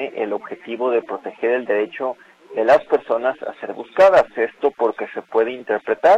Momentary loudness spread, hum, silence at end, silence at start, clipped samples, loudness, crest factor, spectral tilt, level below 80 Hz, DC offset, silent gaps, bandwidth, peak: 15 LU; none; 0 s; 0 s; under 0.1%; -20 LUFS; 16 dB; -5 dB/octave; -60 dBFS; under 0.1%; none; 8.4 kHz; -4 dBFS